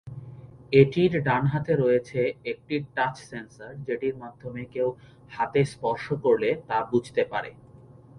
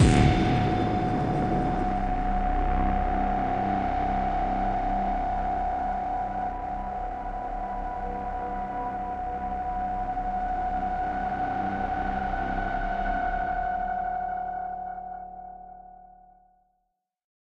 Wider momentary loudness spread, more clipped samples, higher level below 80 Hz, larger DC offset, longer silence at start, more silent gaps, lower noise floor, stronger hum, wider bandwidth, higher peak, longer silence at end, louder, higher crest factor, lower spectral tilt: first, 18 LU vs 7 LU; neither; second, -58 dBFS vs -34 dBFS; neither; about the same, 0.05 s vs 0 s; neither; second, -50 dBFS vs -78 dBFS; neither; about the same, 11 kHz vs 10.5 kHz; first, -4 dBFS vs -8 dBFS; second, 0 s vs 1.35 s; first, -25 LUFS vs -28 LUFS; about the same, 22 dB vs 20 dB; about the same, -7.5 dB/octave vs -7 dB/octave